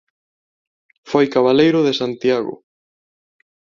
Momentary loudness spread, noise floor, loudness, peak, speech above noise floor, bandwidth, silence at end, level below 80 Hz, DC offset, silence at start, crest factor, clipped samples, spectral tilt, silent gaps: 8 LU; under -90 dBFS; -16 LUFS; -2 dBFS; over 74 dB; 7.4 kHz; 1.25 s; -60 dBFS; under 0.1%; 1.05 s; 18 dB; under 0.1%; -6 dB/octave; none